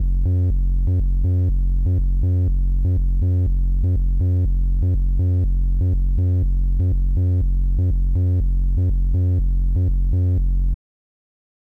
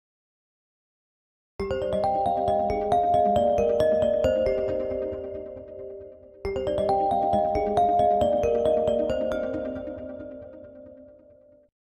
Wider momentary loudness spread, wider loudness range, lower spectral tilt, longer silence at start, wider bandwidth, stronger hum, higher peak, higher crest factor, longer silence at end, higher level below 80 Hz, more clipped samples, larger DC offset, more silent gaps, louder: second, 2 LU vs 18 LU; second, 0 LU vs 4 LU; first, -11.5 dB/octave vs -7 dB/octave; second, 0 s vs 1.6 s; second, 0.9 kHz vs 10 kHz; neither; about the same, -12 dBFS vs -10 dBFS; second, 6 dB vs 16 dB; first, 1 s vs 0.8 s; first, -20 dBFS vs -46 dBFS; neither; neither; neither; first, -21 LUFS vs -24 LUFS